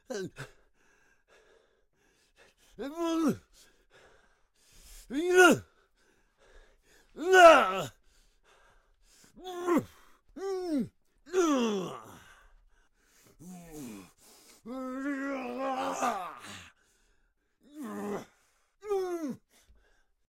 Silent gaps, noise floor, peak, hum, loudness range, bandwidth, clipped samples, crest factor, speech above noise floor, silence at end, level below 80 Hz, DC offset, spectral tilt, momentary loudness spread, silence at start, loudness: none; -72 dBFS; -8 dBFS; none; 15 LU; 16.5 kHz; under 0.1%; 24 dB; 48 dB; 0.95 s; -64 dBFS; under 0.1%; -4 dB/octave; 26 LU; 0.1 s; -28 LUFS